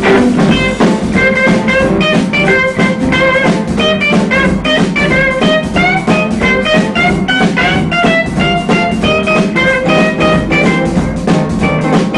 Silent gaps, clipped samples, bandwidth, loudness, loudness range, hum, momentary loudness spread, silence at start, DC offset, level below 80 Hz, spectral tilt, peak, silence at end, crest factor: none; under 0.1%; 11.5 kHz; -10 LUFS; 1 LU; none; 3 LU; 0 s; under 0.1%; -30 dBFS; -5.5 dB/octave; 0 dBFS; 0 s; 10 dB